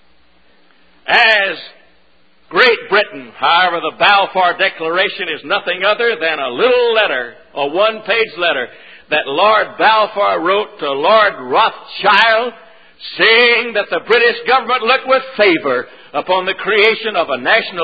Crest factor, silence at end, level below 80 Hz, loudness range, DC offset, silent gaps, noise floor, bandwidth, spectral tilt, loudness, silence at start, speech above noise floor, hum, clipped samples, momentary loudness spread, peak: 14 dB; 0 s; -60 dBFS; 3 LU; 0.4%; none; -55 dBFS; 8 kHz; -4.5 dB/octave; -13 LUFS; 1.05 s; 41 dB; none; under 0.1%; 10 LU; 0 dBFS